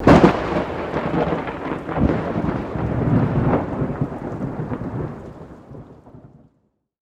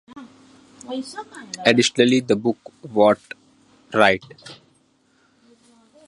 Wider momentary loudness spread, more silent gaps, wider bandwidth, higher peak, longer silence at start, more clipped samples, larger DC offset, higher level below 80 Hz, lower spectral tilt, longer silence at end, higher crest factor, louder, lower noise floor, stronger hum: second, 19 LU vs 24 LU; neither; second, 9.8 kHz vs 11.5 kHz; about the same, 0 dBFS vs 0 dBFS; second, 0 s vs 0.15 s; neither; neither; first, -36 dBFS vs -62 dBFS; first, -8.5 dB/octave vs -4 dB/octave; second, 0.8 s vs 1.55 s; about the same, 20 dB vs 22 dB; about the same, -21 LUFS vs -19 LUFS; first, -66 dBFS vs -61 dBFS; neither